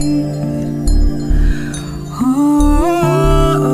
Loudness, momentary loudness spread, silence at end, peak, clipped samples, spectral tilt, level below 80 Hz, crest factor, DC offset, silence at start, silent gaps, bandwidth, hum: -15 LUFS; 8 LU; 0 s; -2 dBFS; under 0.1%; -7 dB/octave; -16 dBFS; 12 dB; under 0.1%; 0 s; none; 15 kHz; none